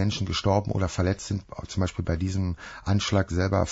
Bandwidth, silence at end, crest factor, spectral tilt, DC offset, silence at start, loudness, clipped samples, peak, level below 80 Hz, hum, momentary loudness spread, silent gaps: 8 kHz; 0 s; 16 dB; -6 dB/octave; under 0.1%; 0 s; -27 LUFS; under 0.1%; -10 dBFS; -42 dBFS; none; 8 LU; none